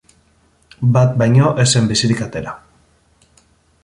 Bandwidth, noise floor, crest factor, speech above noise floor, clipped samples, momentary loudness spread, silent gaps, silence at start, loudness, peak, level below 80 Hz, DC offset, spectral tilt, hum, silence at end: 11.5 kHz; -56 dBFS; 16 dB; 42 dB; under 0.1%; 15 LU; none; 0.8 s; -15 LUFS; 0 dBFS; -46 dBFS; under 0.1%; -5 dB/octave; none; 1.25 s